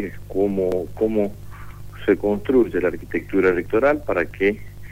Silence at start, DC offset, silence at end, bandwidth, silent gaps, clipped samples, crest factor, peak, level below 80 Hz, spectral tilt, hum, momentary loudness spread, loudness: 0 s; 1%; 0 s; 16 kHz; none; under 0.1%; 16 dB; -6 dBFS; -42 dBFS; -7.5 dB/octave; 50 Hz at -40 dBFS; 12 LU; -21 LUFS